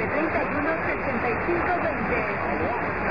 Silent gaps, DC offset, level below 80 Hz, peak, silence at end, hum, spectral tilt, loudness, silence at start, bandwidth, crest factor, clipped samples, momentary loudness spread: none; 0.7%; -44 dBFS; -12 dBFS; 0 s; none; -8.5 dB/octave; -25 LUFS; 0 s; 5.2 kHz; 14 dB; under 0.1%; 2 LU